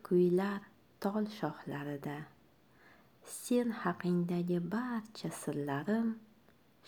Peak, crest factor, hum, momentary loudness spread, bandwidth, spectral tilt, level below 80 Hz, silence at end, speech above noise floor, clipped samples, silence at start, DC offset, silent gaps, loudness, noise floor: -18 dBFS; 18 dB; none; 12 LU; 19.5 kHz; -6.5 dB/octave; -78 dBFS; 0.65 s; 32 dB; under 0.1%; 0.05 s; under 0.1%; none; -36 LUFS; -66 dBFS